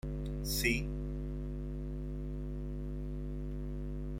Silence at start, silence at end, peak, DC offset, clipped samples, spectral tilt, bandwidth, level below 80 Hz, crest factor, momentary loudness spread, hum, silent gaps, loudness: 0.05 s; 0 s; -16 dBFS; under 0.1%; under 0.1%; -5 dB/octave; 16.5 kHz; -40 dBFS; 20 dB; 9 LU; 50 Hz at -40 dBFS; none; -39 LUFS